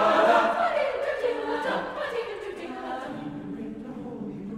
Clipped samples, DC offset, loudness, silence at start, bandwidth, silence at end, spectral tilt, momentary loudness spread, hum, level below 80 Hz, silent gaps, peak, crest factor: under 0.1%; under 0.1%; -28 LUFS; 0 s; 13 kHz; 0 s; -5 dB/octave; 16 LU; none; -60 dBFS; none; -8 dBFS; 20 dB